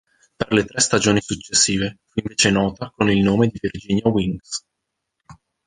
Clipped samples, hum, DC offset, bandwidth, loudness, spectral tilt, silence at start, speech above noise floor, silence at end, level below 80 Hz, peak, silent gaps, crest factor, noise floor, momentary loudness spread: under 0.1%; none; under 0.1%; 10 kHz; -19 LUFS; -4 dB/octave; 0.4 s; 59 dB; 0.35 s; -46 dBFS; -2 dBFS; none; 18 dB; -79 dBFS; 12 LU